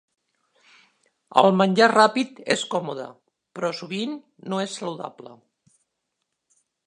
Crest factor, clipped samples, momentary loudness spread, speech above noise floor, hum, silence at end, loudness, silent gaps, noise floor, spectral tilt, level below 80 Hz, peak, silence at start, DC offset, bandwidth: 24 dB; under 0.1%; 19 LU; 57 dB; none; 1.55 s; -22 LUFS; none; -79 dBFS; -4.5 dB/octave; -76 dBFS; -2 dBFS; 1.35 s; under 0.1%; 11 kHz